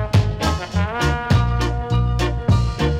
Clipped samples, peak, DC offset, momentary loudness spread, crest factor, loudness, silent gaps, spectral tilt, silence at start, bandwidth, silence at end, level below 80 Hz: under 0.1%; -6 dBFS; under 0.1%; 4 LU; 12 dB; -20 LUFS; none; -6.5 dB/octave; 0 s; 14 kHz; 0 s; -24 dBFS